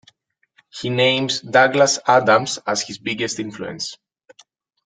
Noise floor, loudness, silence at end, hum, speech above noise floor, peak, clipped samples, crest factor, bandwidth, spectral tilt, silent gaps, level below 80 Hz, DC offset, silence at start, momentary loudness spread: -63 dBFS; -18 LUFS; 0.9 s; none; 45 dB; -2 dBFS; under 0.1%; 20 dB; 9.6 kHz; -3 dB/octave; none; -64 dBFS; under 0.1%; 0.75 s; 15 LU